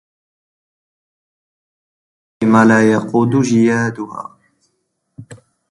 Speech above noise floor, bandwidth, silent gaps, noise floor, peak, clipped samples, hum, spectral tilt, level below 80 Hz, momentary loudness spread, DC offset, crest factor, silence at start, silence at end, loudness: 56 dB; 11 kHz; none; -69 dBFS; 0 dBFS; under 0.1%; none; -6.5 dB/octave; -58 dBFS; 18 LU; under 0.1%; 18 dB; 2.4 s; 0.35 s; -13 LUFS